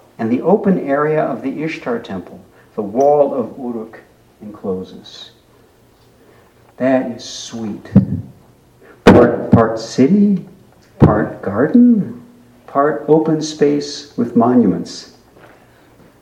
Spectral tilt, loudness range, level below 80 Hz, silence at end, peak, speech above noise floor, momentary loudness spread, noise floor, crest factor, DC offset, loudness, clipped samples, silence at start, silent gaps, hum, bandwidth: -7 dB/octave; 10 LU; -42 dBFS; 1.15 s; 0 dBFS; 34 dB; 17 LU; -50 dBFS; 16 dB; under 0.1%; -15 LUFS; 0.1%; 0.2 s; none; none; 9.6 kHz